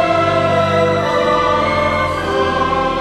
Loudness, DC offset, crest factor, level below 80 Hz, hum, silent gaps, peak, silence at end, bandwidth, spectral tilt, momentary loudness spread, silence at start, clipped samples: -15 LUFS; under 0.1%; 12 dB; -36 dBFS; none; none; -2 dBFS; 0 s; 13 kHz; -5.5 dB/octave; 3 LU; 0 s; under 0.1%